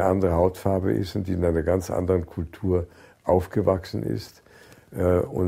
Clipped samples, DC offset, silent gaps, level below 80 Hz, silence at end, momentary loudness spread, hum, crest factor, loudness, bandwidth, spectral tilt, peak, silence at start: under 0.1%; under 0.1%; none; -46 dBFS; 0 s; 11 LU; none; 18 dB; -25 LUFS; 16 kHz; -8 dB/octave; -6 dBFS; 0 s